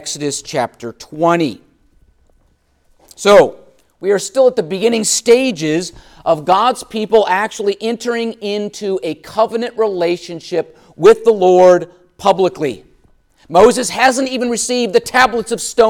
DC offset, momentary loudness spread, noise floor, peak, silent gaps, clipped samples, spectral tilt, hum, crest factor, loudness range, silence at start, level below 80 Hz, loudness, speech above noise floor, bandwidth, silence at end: under 0.1%; 12 LU; -57 dBFS; 0 dBFS; none; under 0.1%; -3.5 dB/octave; none; 14 dB; 4 LU; 0 s; -50 dBFS; -14 LUFS; 43 dB; 16.5 kHz; 0 s